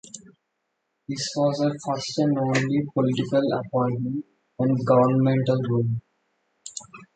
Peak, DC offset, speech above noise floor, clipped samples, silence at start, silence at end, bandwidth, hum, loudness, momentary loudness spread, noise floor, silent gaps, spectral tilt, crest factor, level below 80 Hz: -6 dBFS; under 0.1%; 55 dB; under 0.1%; 0.05 s; 0.1 s; 9.2 kHz; none; -24 LUFS; 18 LU; -77 dBFS; none; -6.5 dB/octave; 18 dB; -62 dBFS